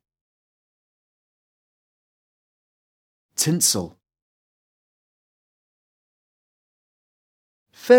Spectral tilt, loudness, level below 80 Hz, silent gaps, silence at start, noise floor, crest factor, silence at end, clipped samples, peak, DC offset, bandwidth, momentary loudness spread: -3.5 dB/octave; -21 LUFS; -70 dBFS; 4.22-7.66 s; 3.4 s; under -90 dBFS; 26 dB; 0 s; under 0.1%; -2 dBFS; under 0.1%; 18.5 kHz; 19 LU